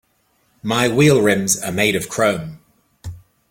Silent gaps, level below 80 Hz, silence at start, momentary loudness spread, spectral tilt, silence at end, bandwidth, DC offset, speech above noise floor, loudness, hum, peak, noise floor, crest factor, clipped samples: none; -50 dBFS; 0.65 s; 23 LU; -4 dB/octave; 0.3 s; 16.5 kHz; under 0.1%; 46 dB; -17 LUFS; none; -2 dBFS; -63 dBFS; 18 dB; under 0.1%